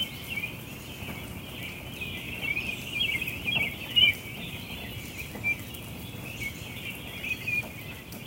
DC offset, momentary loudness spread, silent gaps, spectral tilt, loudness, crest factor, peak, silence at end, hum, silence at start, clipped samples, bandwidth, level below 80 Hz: under 0.1%; 14 LU; none; -3 dB/octave; -30 LUFS; 24 dB; -10 dBFS; 0 s; none; 0 s; under 0.1%; 17 kHz; -52 dBFS